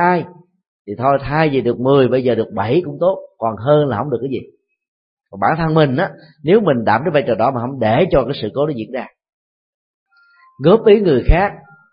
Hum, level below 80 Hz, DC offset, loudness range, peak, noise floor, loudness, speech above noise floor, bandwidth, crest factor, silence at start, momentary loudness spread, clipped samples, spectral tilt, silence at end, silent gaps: none; -30 dBFS; under 0.1%; 3 LU; 0 dBFS; -51 dBFS; -16 LUFS; 36 dB; 5.4 kHz; 16 dB; 0 s; 10 LU; under 0.1%; -12.5 dB/octave; 0.35 s; 0.68-0.85 s, 4.88-5.17 s, 9.33-10.06 s